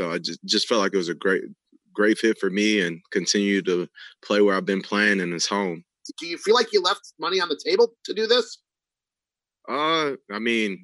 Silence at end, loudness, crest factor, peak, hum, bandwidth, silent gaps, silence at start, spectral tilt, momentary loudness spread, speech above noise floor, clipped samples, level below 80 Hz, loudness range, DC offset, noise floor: 0.05 s; -23 LUFS; 18 dB; -6 dBFS; none; 12 kHz; none; 0 s; -3.5 dB/octave; 10 LU; 67 dB; under 0.1%; -82 dBFS; 2 LU; under 0.1%; -90 dBFS